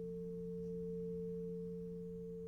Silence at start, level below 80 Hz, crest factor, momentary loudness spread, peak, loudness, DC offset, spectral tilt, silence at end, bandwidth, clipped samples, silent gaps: 0 s; -64 dBFS; 8 dB; 3 LU; -36 dBFS; -45 LUFS; under 0.1%; -10.5 dB/octave; 0 s; 6.2 kHz; under 0.1%; none